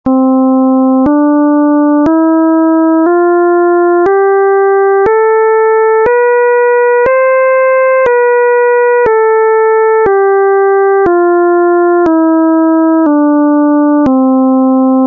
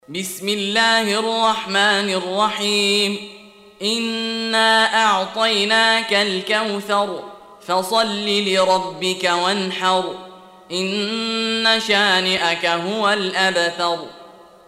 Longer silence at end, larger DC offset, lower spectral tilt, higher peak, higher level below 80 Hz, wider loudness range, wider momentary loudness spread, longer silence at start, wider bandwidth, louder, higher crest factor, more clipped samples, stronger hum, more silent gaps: second, 0 s vs 0.35 s; neither; first, -9 dB/octave vs -2.5 dB/octave; about the same, -2 dBFS vs -4 dBFS; first, -46 dBFS vs -66 dBFS; second, 0 LU vs 3 LU; second, 0 LU vs 9 LU; about the same, 0.05 s vs 0.1 s; second, 3.3 kHz vs 16 kHz; first, -8 LUFS vs -18 LUFS; second, 4 dB vs 16 dB; neither; neither; neither